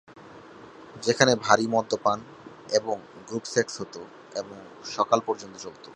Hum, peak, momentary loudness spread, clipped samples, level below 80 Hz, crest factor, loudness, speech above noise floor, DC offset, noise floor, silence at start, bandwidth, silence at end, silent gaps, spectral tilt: none; 0 dBFS; 24 LU; under 0.1%; -68 dBFS; 26 dB; -26 LUFS; 21 dB; under 0.1%; -47 dBFS; 0.1 s; 11.5 kHz; 0 s; none; -3.5 dB/octave